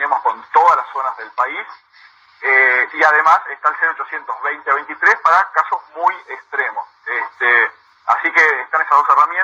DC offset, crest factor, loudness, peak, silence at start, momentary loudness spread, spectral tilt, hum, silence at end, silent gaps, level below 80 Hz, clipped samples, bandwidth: under 0.1%; 16 dB; -15 LUFS; 0 dBFS; 0 s; 11 LU; -1.5 dB/octave; none; 0 s; none; -72 dBFS; under 0.1%; over 20 kHz